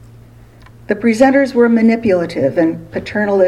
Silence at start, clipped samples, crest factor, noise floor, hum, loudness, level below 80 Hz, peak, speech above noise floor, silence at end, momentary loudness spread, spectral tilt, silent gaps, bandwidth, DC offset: 0.9 s; under 0.1%; 14 dB; -40 dBFS; none; -14 LUFS; -46 dBFS; 0 dBFS; 28 dB; 0 s; 9 LU; -6.5 dB/octave; none; 11.5 kHz; under 0.1%